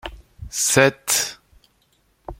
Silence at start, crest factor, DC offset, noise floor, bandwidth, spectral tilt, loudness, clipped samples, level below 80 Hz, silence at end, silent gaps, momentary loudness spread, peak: 0.05 s; 22 dB; under 0.1%; -63 dBFS; 16.5 kHz; -2.5 dB/octave; -19 LUFS; under 0.1%; -46 dBFS; 0.05 s; none; 14 LU; -2 dBFS